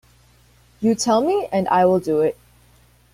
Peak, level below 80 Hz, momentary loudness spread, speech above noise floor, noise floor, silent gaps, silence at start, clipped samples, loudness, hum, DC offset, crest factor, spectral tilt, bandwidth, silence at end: -6 dBFS; -56 dBFS; 7 LU; 36 dB; -54 dBFS; none; 0.8 s; under 0.1%; -19 LUFS; 60 Hz at -50 dBFS; under 0.1%; 16 dB; -5 dB/octave; 16 kHz; 0.8 s